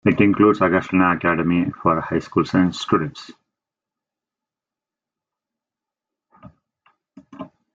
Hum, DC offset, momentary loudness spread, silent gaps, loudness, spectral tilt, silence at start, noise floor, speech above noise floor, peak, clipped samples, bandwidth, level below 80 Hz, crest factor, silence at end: none; under 0.1%; 20 LU; none; -19 LUFS; -7 dB/octave; 0.05 s; -88 dBFS; 70 dB; -2 dBFS; under 0.1%; 7.8 kHz; -56 dBFS; 20 dB; 0.25 s